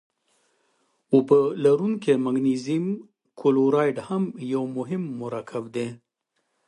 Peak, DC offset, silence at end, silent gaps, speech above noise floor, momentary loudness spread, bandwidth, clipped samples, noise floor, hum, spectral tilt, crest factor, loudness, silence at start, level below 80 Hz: -4 dBFS; under 0.1%; 0.7 s; none; 53 dB; 12 LU; 11 kHz; under 0.1%; -76 dBFS; none; -7.5 dB/octave; 20 dB; -24 LUFS; 1.1 s; -72 dBFS